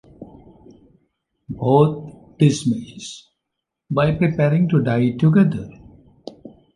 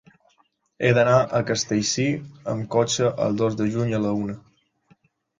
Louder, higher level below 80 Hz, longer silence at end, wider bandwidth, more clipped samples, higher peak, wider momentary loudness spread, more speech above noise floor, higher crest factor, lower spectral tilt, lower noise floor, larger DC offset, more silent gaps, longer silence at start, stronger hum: first, -18 LUFS vs -22 LUFS; first, -50 dBFS vs -56 dBFS; second, 0.25 s vs 1 s; first, 11 kHz vs 9.6 kHz; neither; about the same, -2 dBFS vs -4 dBFS; first, 23 LU vs 11 LU; first, 63 dB vs 43 dB; about the same, 18 dB vs 20 dB; first, -7.5 dB/octave vs -5 dB/octave; first, -81 dBFS vs -65 dBFS; neither; neither; second, 0.2 s vs 0.8 s; neither